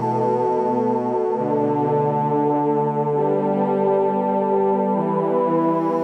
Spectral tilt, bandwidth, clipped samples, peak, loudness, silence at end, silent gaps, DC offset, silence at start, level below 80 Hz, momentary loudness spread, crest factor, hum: -10 dB/octave; 8.2 kHz; under 0.1%; -8 dBFS; -20 LUFS; 0 s; none; under 0.1%; 0 s; -80 dBFS; 2 LU; 12 dB; none